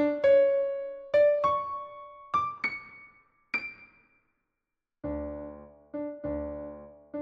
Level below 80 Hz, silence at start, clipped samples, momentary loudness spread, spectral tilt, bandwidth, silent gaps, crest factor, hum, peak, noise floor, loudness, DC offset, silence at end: -54 dBFS; 0 s; under 0.1%; 21 LU; -7 dB/octave; 6 kHz; none; 16 dB; none; -14 dBFS; -86 dBFS; -28 LUFS; under 0.1%; 0 s